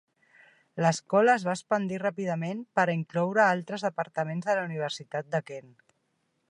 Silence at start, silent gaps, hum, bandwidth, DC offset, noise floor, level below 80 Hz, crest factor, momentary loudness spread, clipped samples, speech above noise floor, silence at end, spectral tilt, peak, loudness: 0.75 s; none; none; 11 kHz; under 0.1%; -75 dBFS; -78 dBFS; 20 dB; 9 LU; under 0.1%; 48 dB; 0.9 s; -5.5 dB/octave; -8 dBFS; -28 LUFS